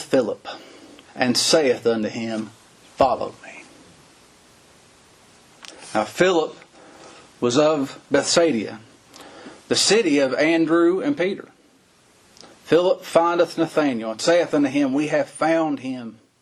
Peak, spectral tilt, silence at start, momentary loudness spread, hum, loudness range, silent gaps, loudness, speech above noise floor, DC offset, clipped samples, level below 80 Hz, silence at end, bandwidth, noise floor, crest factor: -2 dBFS; -3.5 dB/octave; 0 s; 20 LU; none; 8 LU; none; -20 LUFS; 36 dB; under 0.1%; under 0.1%; -62 dBFS; 0.3 s; 13 kHz; -56 dBFS; 20 dB